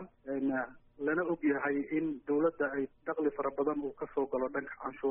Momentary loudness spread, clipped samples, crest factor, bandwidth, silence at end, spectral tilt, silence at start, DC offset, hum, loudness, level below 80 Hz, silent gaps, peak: 7 LU; under 0.1%; 16 dB; 3.4 kHz; 0 s; -1.5 dB/octave; 0 s; under 0.1%; none; -34 LUFS; -68 dBFS; none; -18 dBFS